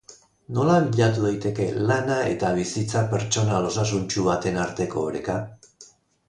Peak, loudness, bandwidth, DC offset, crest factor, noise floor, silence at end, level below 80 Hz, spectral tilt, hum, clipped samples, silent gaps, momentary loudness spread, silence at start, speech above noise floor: -6 dBFS; -24 LUFS; 10.5 kHz; under 0.1%; 18 dB; -52 dBFS; 0.45 s; -50 dBFS; -5.5 dB/octave; none; under 0.1%; none; 7 LU; 0.1 s; 30 dB